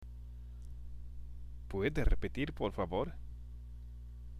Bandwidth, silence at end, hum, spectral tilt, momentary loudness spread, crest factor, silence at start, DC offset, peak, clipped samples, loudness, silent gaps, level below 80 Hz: 10.5 kHz; 0 s; 60 Hz at -50 dBFS; -7.5 dB/octave; 15 LU; 20 dB; 0 s; under 0.1%; -18 dBFS; under 0.1%; -38 LUFS; none; -42 dBFS